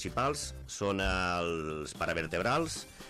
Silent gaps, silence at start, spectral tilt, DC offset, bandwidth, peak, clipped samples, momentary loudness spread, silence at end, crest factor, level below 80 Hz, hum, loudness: none; 0 s; -4 dB/octave; under 0.1%; 15.5 kHz; -18 dBFS; under 0.1%; 7 LU; 0 s; 14 dB; -48 dBFS; none; -33 LUFS